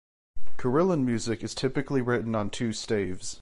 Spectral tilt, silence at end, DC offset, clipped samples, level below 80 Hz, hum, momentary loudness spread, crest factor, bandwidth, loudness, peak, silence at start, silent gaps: -5.5 dB/octave; 0 s; under 0.1%; under 0.1%; -52 dBFS; none; 7 LU; 14 dB; 11.5 kHz; -28 LUFS; -12 dBFS; 0.35 s; none